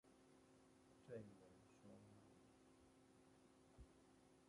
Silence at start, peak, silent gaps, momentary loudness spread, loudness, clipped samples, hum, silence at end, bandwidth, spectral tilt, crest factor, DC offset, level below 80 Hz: 0.05 s; -44 dBFS; none; 10 LU; -64 LUFS; under 0.1%; none; 0 s; 11 kHz; -6 dB/octave; 22 dB; under 0.1%; -80 dBFS